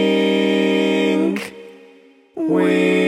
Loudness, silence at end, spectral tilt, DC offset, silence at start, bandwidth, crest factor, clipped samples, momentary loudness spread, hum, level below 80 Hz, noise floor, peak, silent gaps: -17 LUFS; 0 s; -6 dB/octave; under 0.1%; 0 s; 14 kHz; 14 dB; under 0.1%; 11 LU; none; -72 dBFS; -48 dBFS; -4 dBFS; none